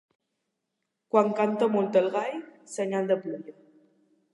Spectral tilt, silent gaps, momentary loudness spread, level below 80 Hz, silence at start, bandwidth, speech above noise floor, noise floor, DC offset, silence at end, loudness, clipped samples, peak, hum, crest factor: -6 dB/octave; none; 16 LU; -84 dBFS; 1.15 s; 11.5 kHz; 56 dB; -82 dBFS; under 0.1%; 0.8 s; -26 LUFS; under 0.1%; -8 dBFS; none; 22 dB